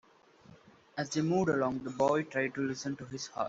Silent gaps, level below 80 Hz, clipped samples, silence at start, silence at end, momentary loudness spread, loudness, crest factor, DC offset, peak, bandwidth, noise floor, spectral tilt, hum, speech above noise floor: none; -68 dBFS; under 0.1%; 0.5 s; 0 s; 11 LU; -33 LUFS; 18 dB; under 0.1%; -16 dBFS; 8 kHz; -59 dBFS; -5.5 dB/octave; none; 27 dB